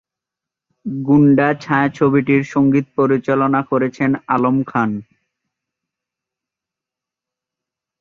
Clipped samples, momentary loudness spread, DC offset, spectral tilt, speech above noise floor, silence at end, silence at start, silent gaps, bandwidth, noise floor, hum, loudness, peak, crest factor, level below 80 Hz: under 0.1%; 8 LU; under 0.1%; -8.5 dB/octave; 71 dB; 3 s; 0.85 s; none; 7 kHz; -86 dBFS; none; -16 LUFS; -2 dBFS; 16 dB; -56 dBFS